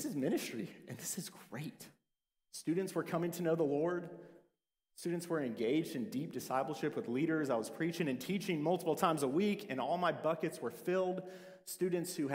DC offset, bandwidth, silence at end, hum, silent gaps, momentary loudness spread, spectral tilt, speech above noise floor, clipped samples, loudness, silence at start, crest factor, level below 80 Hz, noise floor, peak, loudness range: under 0.1%; 16 kHz; 0 s; none; none; 13 LU; -5.5 dB/octave; 50 dB; under 0.1%; -37 LUFS; 0 s; 20 dB; -82 dBFS; -87 dBFS; -18 dBFS; 4 LU